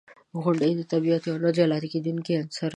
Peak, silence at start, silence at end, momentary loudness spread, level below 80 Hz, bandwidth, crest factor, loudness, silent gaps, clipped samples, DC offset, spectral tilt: -8 dBFS; 0.35 s; 0 s; 6 LU; -74 dBFS; 10.5 kHz; 16 dB; -25 LUFS; none; under 0.1%; under 0.1%; -7 dB/octave